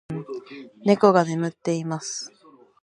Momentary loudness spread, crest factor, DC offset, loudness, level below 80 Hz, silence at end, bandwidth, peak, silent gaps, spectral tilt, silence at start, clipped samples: 19 LU; 22 dB; under 0.1%; -23 LUFS; -66 dBFS; 0.55 s; 11 kHz; -2 dBFS; none; -5.5 dB/octave; 0.1 s; under 0.1%